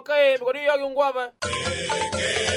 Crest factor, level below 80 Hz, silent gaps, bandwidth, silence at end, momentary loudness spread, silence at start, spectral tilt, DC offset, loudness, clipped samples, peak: 14 dB; -52 dBFS; none; 13.5 kHz; 0 s; 7 LU; 0 s; -2.5 dB/octave; under 0.1%; -23 LUFS; under 0.1%; -8 dBFS